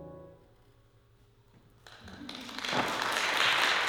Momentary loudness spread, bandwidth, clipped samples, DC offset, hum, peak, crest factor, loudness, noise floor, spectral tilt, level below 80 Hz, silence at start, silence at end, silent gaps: 25 LU; over 20 kHz; under 0.1%; under 0.1%; none; -10 dBFS; 22 dB; -29 LUFS; -63 dBFS; -1.5 dB/octave; -66 dBFS; 0 s; 0 s; none